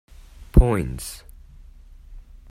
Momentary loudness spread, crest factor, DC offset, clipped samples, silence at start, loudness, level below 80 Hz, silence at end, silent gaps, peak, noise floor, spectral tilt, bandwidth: 18 LU; 24 dB; under 0.1%; under 0.1%; 0.4 s; -22 LUFS; -24 dBFS; 0.3 s; none; 0 dBFS; -45 dBFS; -7 dB/octave; 15 kHz